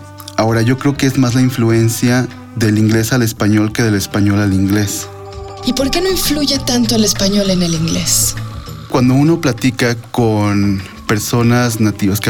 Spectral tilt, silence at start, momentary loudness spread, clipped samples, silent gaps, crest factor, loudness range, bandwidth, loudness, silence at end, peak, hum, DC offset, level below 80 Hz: -5 dB/octave; 0 s; 7 LU; under 0.1%; none; 10 dB; 1 LU; 18 kHz; -14 LUFS; 0 s; -2 dBFS; none; under 0.1%; -34 dBFS